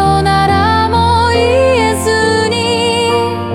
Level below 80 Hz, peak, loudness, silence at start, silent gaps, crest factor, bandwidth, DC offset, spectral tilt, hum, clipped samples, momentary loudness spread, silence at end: -34 dBFS; 0 dBFS; -11 LUFS; 0 s; none; 10 dB; 16.5 kHz; under 0.1%; -5 dB/octave; none; under 0.1%; 2 LU; 0 s